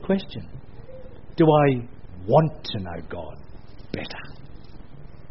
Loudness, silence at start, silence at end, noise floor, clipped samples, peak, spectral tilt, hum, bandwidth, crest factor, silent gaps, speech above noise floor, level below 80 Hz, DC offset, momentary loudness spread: -23 LUFS; 0 s; 0.25 s; -43 dBFS; under 0.1%; -4 dBFS; -6.5 dB/octave; none; 5.8 kHz; 22 dB; none; 21 dB; -46 dBFS; 1%; 25 LU